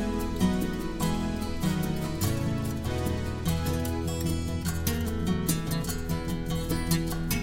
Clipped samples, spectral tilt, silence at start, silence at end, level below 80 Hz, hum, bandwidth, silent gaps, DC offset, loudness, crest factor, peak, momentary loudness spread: under 0.1%; -5.5 dB/octave; 0 s; 0 s; -38 dBFS; none; 16.5 kHz; none; 0.4%; -30 LUFS; 18 dB; -10 dBFS; 4 LU